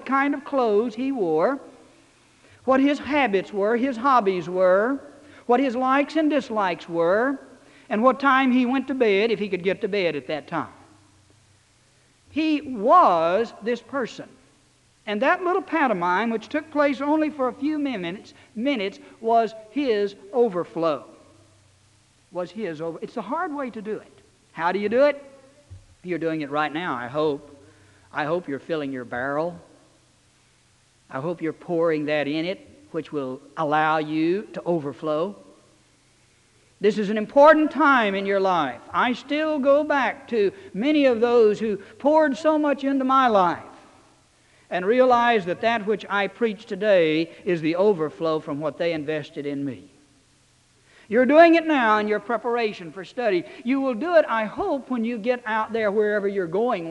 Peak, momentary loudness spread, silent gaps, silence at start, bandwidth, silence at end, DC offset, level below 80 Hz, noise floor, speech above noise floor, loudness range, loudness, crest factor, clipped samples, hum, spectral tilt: -2 dBFS; 13 LU; none; 0 s; 10.5 kHz; 0 s; under 0.1%; -66 dBFS; -60 dBFS; 38 dB; 8 LU; -22 LUFS; 20 dB; under 0.1%; none; -6 dB/octave